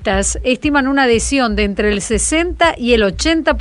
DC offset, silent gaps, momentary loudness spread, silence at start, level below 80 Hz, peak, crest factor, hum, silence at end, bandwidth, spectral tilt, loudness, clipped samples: under 0.1%; none; 3 LU; 0 s; -28 dBFS; 0 dBFS; 14 dB; none; 0 s; 11.5 kHz; -3.5 dB/octave; -14 LUFS; under 0.1%